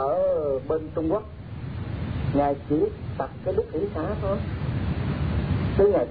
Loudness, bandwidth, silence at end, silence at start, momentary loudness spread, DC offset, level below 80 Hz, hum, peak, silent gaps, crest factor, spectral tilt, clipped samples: -26 LUFS; 5 kHz; 0 s; 0 s; 9 LU; 0.2%; -38 dBFS; none; -10 dBFS; none; 16 dB; -11.5 dB/octave; under 0.1%